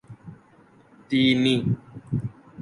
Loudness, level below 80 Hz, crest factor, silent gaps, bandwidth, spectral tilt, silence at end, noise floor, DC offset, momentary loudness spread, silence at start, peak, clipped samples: -24 LUFS; -56 dBFS; 18 dB; none; 11.5 kHz; -6.5 dB/octave; 0 s; -55 dBFS; under 0.1%; 21 LU; 0.1 s; -8 dBFS; under 0.1%